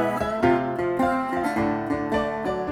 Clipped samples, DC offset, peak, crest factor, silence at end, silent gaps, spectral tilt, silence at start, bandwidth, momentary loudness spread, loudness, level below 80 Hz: under 0.1%; under 0.1%; -8 dBFS; 16 dB; 0 s; none; -6.5 dB/octave; 0 s; 14 kHz; 4 LU; -24 LUFS; -46 dBFS